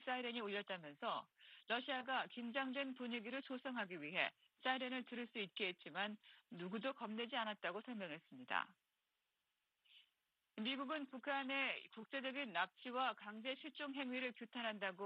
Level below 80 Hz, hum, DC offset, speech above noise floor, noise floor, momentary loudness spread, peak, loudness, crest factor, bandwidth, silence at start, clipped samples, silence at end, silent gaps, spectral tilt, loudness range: under -90 dBFS; none; under 0.1%; 44 dB; -90 dBFS; 7 LU; -24 dBFS; -45 LUFS; 22 dB; 8.6 kHz; 0 s; under 0.1%; 0 s; none; -6 dB/octave; 4 LU